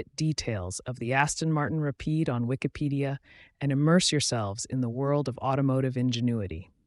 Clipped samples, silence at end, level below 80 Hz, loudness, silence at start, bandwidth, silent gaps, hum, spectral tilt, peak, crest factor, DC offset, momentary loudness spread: under 0.1%; 0.25 s; -54 dBFS; -28 LUFS; 0 s; 11.5 kHz; none; none; -5 dB/octave; -10 dBFS; 18 dB; under 0.1%; 10 LU